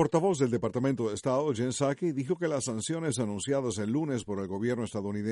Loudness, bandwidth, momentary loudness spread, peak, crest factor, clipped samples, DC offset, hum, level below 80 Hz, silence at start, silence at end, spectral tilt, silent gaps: -30 LUFS; 11.5 kHz; 5 LU; -14 dBFS; 16 dB; under 0.1%; under 0.1%; none; -64 dBFS; 0 s; 0 s; -5.5 dB/octave; none